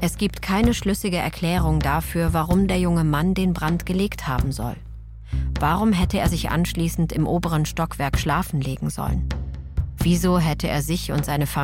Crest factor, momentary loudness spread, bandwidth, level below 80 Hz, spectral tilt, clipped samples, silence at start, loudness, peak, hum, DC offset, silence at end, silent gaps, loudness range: 16 dB; 8 LU; 17 kHz; -30 dBFS; -6 dB/octave; under 0.1%; 0 s; -22 LUFS; -6 dBFS; none; under 0.1%; 0 s; none; 2 LU